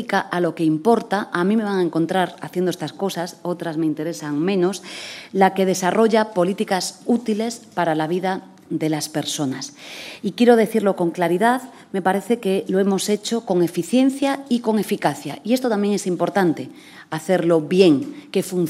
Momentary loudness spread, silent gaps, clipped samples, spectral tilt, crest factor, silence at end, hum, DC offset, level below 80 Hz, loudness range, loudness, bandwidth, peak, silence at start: 10 LU; none; under 0.1%; -5.5 dB/octave; 18 dB; 0 s; none; under 0.1%; -72 dBFS; 3 LU; -20 LUFS; 16 kHz; -2 dBFS; 0 s